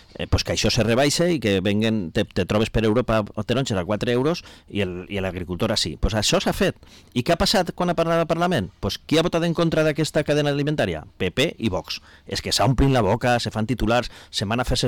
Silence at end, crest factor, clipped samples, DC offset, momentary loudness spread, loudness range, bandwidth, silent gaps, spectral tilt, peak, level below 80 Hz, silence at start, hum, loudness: 0 s; 10 dB; under 0.1%; under 0.1%; 9 LU; 2 LU; 19 kHz; none; -5 dB/octave; -12 dBFS; -36 dBFS; 0.2 s; none; -22 LUFS